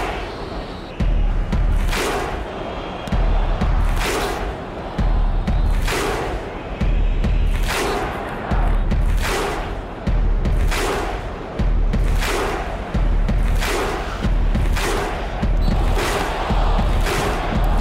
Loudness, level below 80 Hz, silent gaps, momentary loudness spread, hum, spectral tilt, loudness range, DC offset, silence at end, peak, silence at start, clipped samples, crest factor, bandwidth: -22 LUFS; -20 dBFS; none; 7 LU; none; -5.5 dB/octave; 2 LU; under 0.1%; 0 s; -6 dBFS; 0 s; under 0.1%; 12 dB; 15.5 kHz